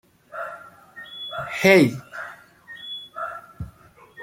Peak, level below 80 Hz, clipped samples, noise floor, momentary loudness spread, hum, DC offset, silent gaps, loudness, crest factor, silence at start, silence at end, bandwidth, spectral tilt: -2 dBFS; -56 dBFS; under 0.1%; -50 dBFS; 25 LU; none; under 0.1%; none; -22 LUFS; 24 dB; 0.35 s; 0 s; 16.5 kHz; -5.5 dB/octave